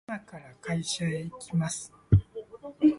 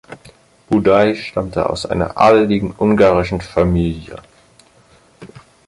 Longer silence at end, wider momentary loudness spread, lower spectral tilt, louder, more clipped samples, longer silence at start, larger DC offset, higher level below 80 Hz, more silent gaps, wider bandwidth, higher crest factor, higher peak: second, 0 s vs 0.4 s; first, 17 LU vs 10 LU; about the same, -6 dB/octave vs -7 dB/octave; second, -30 LUFS vs -15 LUFS; neither; about the same, 0.1 s vs 0.1 s; neither; second, -42 dBFS vs -36 dBFS; neither; about the same, 11.5 kHz vs 11.5 kHz; about the same, 20 dB vs 16 dB; second, -8 dBFS vs 0 dBFS